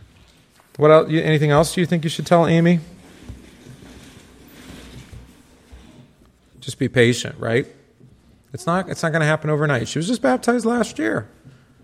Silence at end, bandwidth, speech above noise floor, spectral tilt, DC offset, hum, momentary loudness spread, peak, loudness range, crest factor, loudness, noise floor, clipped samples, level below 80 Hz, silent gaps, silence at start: 0.6 s; 15 kHz; 35 dB; -6 dB/octave; under 0.1%; none; 25 LU; 0 dBFS; 7 LU; 20 dB; -19 LUFS; -53 dBFS; under 0.1%; -50 dBFS; none; 0.8 s